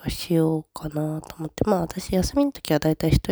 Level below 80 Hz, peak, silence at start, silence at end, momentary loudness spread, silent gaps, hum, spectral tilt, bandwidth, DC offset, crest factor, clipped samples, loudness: -36 dBFS; -4 dBFS; 0 s; 0 s; 8 LU; none; none; -6.5 dB/octave; over 20 kHz; under 0.1%; 18 dB; under 0.1%; -24 LUFS